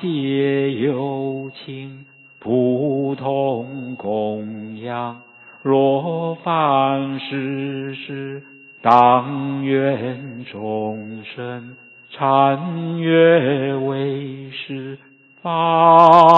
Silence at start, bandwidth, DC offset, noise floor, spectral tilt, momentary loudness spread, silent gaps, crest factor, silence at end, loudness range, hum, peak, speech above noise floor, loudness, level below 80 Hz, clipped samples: 0 s; 8 kHz; under 0.1%; -44 dBFS; -8.5 dB/octave; 18 LU; none; 18 dB; 0 s; 4 LU; none; 0 dBFS; 27 dB; -18 LUFS; -68 dBFS; under 0.1%